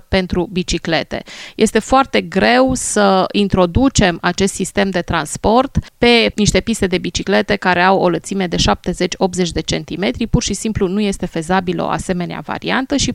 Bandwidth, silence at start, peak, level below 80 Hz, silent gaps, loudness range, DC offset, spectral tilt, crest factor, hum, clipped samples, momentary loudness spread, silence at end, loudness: 13.5 kHz; 0.1 s; 0 dBFS; -32 dBFS; none; 4 LU; under 0.1%; -4.5 dB/octave; 16 dB; none; under 0.1%; 7 LU; 0 s; -16 LUFS